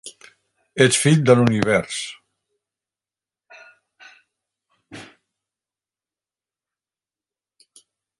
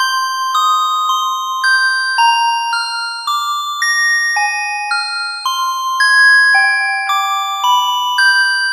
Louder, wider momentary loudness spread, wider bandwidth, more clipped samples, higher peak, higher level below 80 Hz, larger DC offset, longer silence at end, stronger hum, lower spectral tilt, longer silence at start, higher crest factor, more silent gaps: second, -17 LUFS vs -13 LUFS; first, 26 LU vs 9 LU; second, 11.5 kHz vs 15.5 kHz; neither; about the same, 0 dBFS vs -2 dBFS; first, -58 dBFS vs under -90 dBFS; neither; first, 3.15 s vs 0 s; neither; first, -5 dB/octave vs 8 dB/octave; about the same, 0.05 s vs 0 s; first, 24 dB vs 12 dB; neither